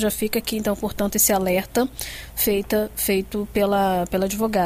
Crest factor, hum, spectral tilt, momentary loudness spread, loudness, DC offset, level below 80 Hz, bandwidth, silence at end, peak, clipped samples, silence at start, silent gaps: 16 dB; none; -4 dB/octave; 7 LU; -22 LUFS; under 0.1%; -42 dBFS; 16 kHz; 0 s; -6 dBFS; under 0.1%; 0 s; none